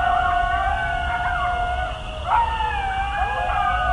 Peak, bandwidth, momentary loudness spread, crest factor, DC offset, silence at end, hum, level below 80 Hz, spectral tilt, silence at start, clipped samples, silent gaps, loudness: -6 dBFS; 11 kHz; 4 LU; 14 dB; under 0.1%; 0 s; none; -30 dBFS; -5 dB/octave; 0 s; under 0.1%; none; -22 LUFS